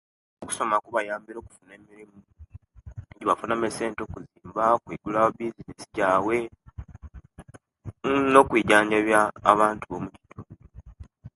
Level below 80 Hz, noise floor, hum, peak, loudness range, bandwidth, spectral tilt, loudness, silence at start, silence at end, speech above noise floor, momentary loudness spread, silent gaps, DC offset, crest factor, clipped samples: -52 dBFS; -49 dBFS; none; 0 dBFS; 10 LU; 12 kHz; -4.5 dB/octave; -24 LUFS; 0.4 s; 0.1 s; 25 dB; 25 LU; none; under 0.1%; 26 dB; under 0.1%